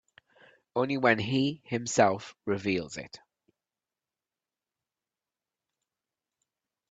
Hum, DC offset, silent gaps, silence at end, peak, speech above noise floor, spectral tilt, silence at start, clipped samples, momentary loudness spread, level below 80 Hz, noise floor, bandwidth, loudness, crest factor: none; under 0.1%; none; 3.75 s; -8 dBFS; over 62 dB; -4.5 dB/octave; 0.75 s; under 0.1%; 13 LU; -70 dBFS; under -90 dBFS; 9.2 kHz; -28 LUFS; 24 dB